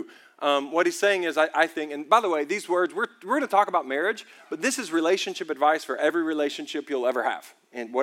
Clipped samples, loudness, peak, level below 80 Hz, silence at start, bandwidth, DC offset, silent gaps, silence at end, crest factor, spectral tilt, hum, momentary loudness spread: under 0.1%; -25 LUFS; -4 dBFS; under -90 dBFS; 0 s; 16.5 kHz; under 0.1%; none; 0 s; 20 dB; -2.5 dB/octave; none; 9 LU